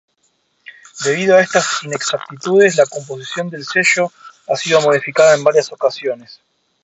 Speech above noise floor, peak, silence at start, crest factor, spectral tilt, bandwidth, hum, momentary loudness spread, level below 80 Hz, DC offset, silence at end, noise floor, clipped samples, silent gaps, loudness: 48 dB; 0 dBFS; 0.95 s; 16 dB; -3 dB/octave; 8.2 kHz; none; 12 LU; -62 dBFS; under 0.1%; 0.5 s; -63 dBFS; under 0.1%; none; -15 LUFS